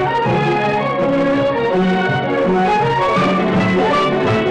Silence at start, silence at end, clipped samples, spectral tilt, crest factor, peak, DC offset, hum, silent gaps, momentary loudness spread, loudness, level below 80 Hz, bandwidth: 0 s; 0 s; under 0.1%; -7 dB/octave; 4 dB; -10 dBFS; under 0.1%; none; none; 2 LU; -15 LUFS; -44 dBFS; 10 kHz